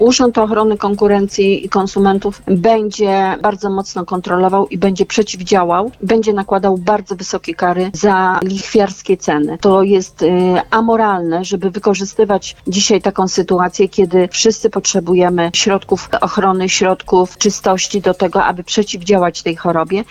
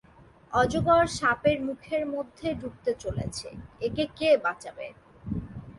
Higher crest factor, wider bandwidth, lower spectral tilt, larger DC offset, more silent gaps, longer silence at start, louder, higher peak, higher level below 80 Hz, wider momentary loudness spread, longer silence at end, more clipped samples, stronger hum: second, 12 dB vs 20 dB; second, 10 kHz vs 11.5 kHz; about the same, -4.5 dB/octave vs -5 dB/octave; neither; neither; second, 0 s vs 0.5 s; first, -14 LUFS vs -27 LUFS; first, -2 dBFS vs -8 dBFS; about the same, -44 dBFS vs -48 dBFS; second, 5 LU vs 16 LU; about the same, 0.1 s vs 0 s; neither; neither